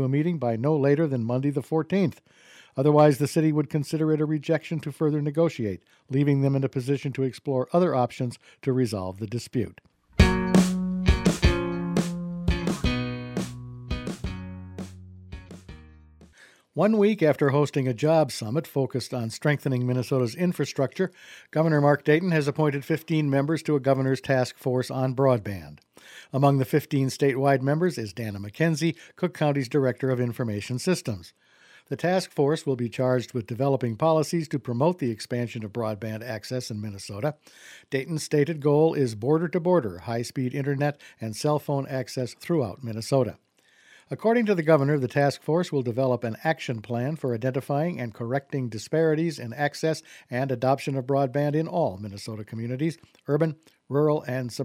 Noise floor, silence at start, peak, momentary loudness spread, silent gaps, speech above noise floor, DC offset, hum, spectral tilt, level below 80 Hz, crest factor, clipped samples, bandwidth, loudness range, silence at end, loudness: -58 dBFS; 0 s; -4 dBFS; 12 LU; none; 33 dB; under 0.1%; none; -7 dB/octave; -40 dBFS; 22 dB; under 0.1%; 15.5 kHz; 5 LU; 0 s; -26 LUFS